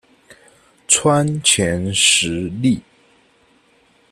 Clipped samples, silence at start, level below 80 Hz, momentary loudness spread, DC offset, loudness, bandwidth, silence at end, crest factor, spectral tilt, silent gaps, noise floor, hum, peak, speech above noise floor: under 0.1%; 0.3 s; -50 dBFS; 7 LU; under 0.1%; -15 LUFS; 14 kHz; 1.3 s; 20 dB; -3 dB/octave; none; -56 dBFS; none; 0 dBFS; 39 dB